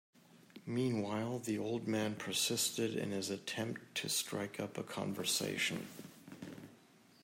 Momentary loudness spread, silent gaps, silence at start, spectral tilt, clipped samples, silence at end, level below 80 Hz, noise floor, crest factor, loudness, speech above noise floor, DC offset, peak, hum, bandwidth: 17 LU; none; 0.35 s; -3.5 dB/octave; under 0.1%; 0.5 s; -82 dBFS; -64 dBFS; 18 dB; -38 LUFS; 26 dB; under 0.1%; -22 dBFS; none; 16 kHz